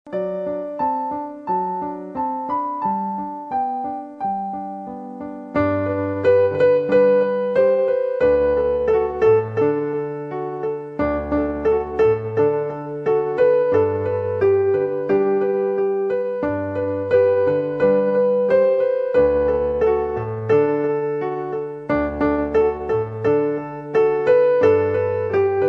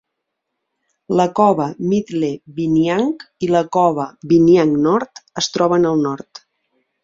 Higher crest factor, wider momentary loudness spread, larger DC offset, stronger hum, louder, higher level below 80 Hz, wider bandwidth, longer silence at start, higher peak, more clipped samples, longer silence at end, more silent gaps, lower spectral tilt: about the same, 14 dB vs 16 dB; about the same, 10 LU vs 10 LU; neither; neither; second, -20 LUFS vs -17 LUFS; first, -44 dBFS vs -56 dBFS; second, 5.2 kHz vs 7.6 kHz; second, 0.05 s vs 1.1 s; about the same, -4 dBFS vs -2 dBFS; neither; second, 0 s vs 0.85 s; neither; first, -9 dB/octave vs -6 dB/octave